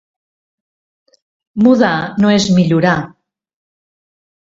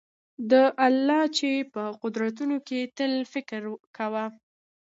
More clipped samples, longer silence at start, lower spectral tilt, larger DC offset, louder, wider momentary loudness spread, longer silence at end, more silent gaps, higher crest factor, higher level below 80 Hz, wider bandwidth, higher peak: neither; first, 1.55 s vs 0.4 s; first, -6 dB/octave vs -4 dB/octave; neither; first, -13 LUFS vs -26 LUFS; second, 10 LU vs 14 LU; first, 1.45 s vs 0.55 s; second, none vs 3.80-3.94 s; about the same, 16 dB vs 18 dB; first, -52 dBFS vs -80 dBFS; about the same, 7.8 kHz vs 7.8 kHz; first, 0 dBFS vs -8 dBFS